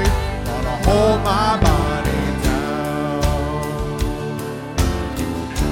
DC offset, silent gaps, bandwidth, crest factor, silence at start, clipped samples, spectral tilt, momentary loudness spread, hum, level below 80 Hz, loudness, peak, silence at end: under 0.1%; none; 17 kHz; 18 dB; 0 s; under 0.1%; -5.5 dB/octave; 8 LU; none; -24 dBFS; -20 LUFS; 0 dBFS; 0 s